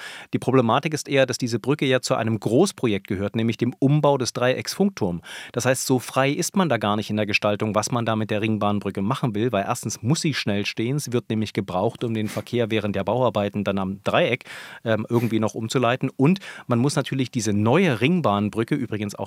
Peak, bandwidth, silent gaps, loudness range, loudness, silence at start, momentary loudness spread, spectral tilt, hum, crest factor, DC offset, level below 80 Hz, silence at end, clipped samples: -2 dBFS; 16.5 kHz; none; 3 LU; -23 LUFS; 0 s; 6 LU; -5.5 dB/octave; none; 20 dB; under 0.1%; -68 dBFS; 0 s; under 0.1%